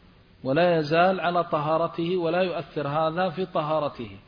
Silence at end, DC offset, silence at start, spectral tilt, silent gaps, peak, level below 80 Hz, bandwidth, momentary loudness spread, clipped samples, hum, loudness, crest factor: 0.1 s; under 0.1%; 0.45 s; -8 dB/octave; none; -10 dBFS; -60 dBFS; 5.2 kHz; 7 LU; under 0.1%; none; -25 LUFS; 16 dB